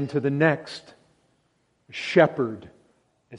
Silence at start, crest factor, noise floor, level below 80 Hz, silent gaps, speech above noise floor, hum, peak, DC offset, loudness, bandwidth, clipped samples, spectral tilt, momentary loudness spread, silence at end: 0 s; 24 dB; -69 dBFS; -66 dBFS; none; 45 dB; none; -2 dBFS; under 0.1%; -23 LUFS; 11 kHz; under 0.1%; -7 dB/octave; 20 LU; 0 s